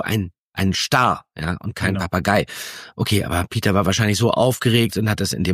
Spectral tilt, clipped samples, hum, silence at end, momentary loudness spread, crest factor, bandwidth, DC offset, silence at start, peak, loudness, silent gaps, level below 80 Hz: -5 dB/octave; under 0.1%; none; 0 s; 9 LU; 18 dB; 15.5 kHz; under 0.1%; 0 s; -2 dBFS; -20 LUFS; 0.39-0.52 s; -42 dBFS